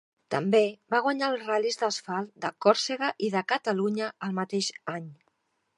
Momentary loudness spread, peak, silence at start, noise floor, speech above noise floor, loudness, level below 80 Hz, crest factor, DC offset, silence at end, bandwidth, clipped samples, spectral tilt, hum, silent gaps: 10 LU; -6 dBFS; 0.3 s; -74 dBFS; 46 dB; -28 LUFS; -82 dBFS; 22 dB; under 0.1%; 0.65 s; 11.5 kHz; under 0.1%; -4 dB/octave; none; none